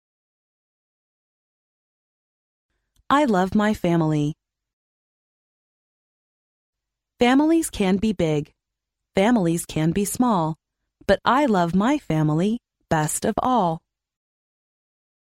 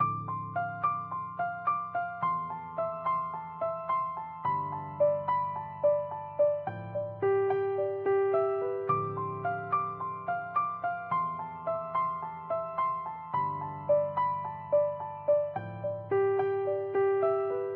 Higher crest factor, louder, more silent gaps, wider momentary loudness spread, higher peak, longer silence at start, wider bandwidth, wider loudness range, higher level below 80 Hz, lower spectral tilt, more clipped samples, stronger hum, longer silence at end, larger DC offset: about the same, 18 dB vs 14 dB; first, -21 LUFS vs -31 LUFS; first, 4.73-6.73 s vs none; about the same, 9 LU vs 8 LU; first, -6 dBFS vs -16 dBFS; first, 3.1 s vs 0 s; first, 16 kHz vs 4.3 kHz; first, 6 LU vs 3 LU; first, -50 dBFS vs -70 dBFS; about the same, -5.5 dB/octave vs -6.5 dB/octave; neither; neither; first, 1.55 s vs 0 s; neither